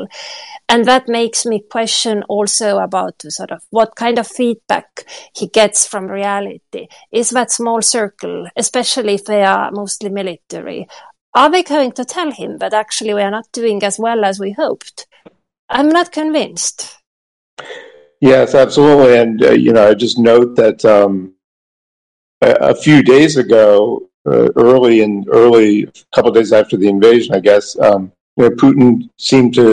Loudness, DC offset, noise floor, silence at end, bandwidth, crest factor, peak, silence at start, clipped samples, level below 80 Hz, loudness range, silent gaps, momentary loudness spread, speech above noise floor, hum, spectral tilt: -12 LUFS; under 0.1%; under -90 dBFS; 0 s; 11.5 kHz; 12 dB; 0 dBFS; 0 s; under 0.1%; -52 dBFS; 8 LU; 11.21-11.33 s, 15.59-15.68 s, 17.07-17.57 s, 21.44-22.41 s, 24.14-24.25 s, 28.20-28.36 s; 16 LU; over 78 dB; none; -4 dB/octave